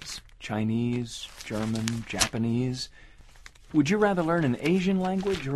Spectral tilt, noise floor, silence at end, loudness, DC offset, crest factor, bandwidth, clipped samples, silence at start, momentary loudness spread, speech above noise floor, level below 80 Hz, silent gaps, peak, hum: -5 dB/octave; -50 dBFS; 0 s; -27 LUFS; under 0.1%; 22 dB; 13.5 kHz; under 0.1%; 0 s; 12 LU; 24 dB; -50 dBFS; none; -6 dBFS; none